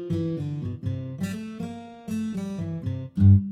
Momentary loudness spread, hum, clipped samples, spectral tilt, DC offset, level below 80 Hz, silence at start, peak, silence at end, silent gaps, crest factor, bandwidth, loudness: 15 LU; none; under 0.1%; -9 dB/octave; under 0.1%; -50 dBFS; 0 s; -8 dBFS; 0 s; none; 18 dB; 9.2 kHz; -27 LUFS